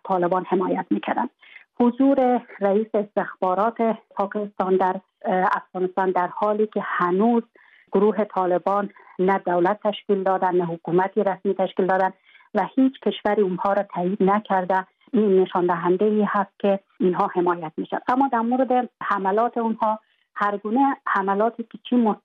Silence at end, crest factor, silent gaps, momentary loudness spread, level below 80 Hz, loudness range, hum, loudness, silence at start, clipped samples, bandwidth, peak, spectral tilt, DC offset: 0.05 s; 14 dB; none; 6 LU; -70 dBFS; 2 LU; none; -22 LUFS; 0.05 s; under 0.1%; 5.4 kHz; -6 dBFS; -9 dB/octave; under 0.1%